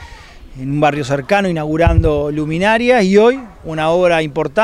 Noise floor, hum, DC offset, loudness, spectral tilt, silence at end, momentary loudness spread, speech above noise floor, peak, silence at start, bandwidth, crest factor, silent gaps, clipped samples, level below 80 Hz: -36 dBFS; none; under 0.1%; -14 LUFS; -6.5 dB/octave; 0 s; 9 LU; 22 dB; 0 dBFS; 0 s; 12.5 kHz; 14 dB; none; under 0.1%; -28 dBFS